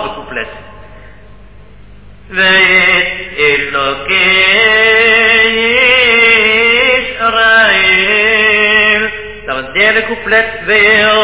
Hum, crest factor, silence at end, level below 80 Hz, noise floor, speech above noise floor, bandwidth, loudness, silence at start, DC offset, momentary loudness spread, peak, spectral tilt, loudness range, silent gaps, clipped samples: 50 Hz at -40 dBFS; 10 dB; 0 s; -38 dBFS; -37 dBFS; 27 dB; 4 kHz; -7 LUFS; 0 s; 0.9%; 12 LU; 0 dBFS; -5.5 dB/octave; 5 LU; none; 0.1%